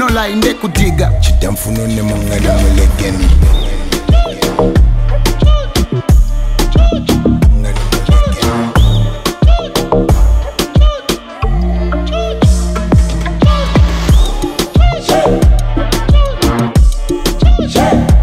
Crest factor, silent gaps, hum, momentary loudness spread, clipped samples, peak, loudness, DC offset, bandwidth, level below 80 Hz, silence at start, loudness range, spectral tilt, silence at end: 10 dB; none; none; 5 LU; under 0.1%; 0 dBFS; -12 LUFS; under 0.1%; 16 kHz; -12 dBFS; 0 s; 2 LU; -6 dB/octave; 0 s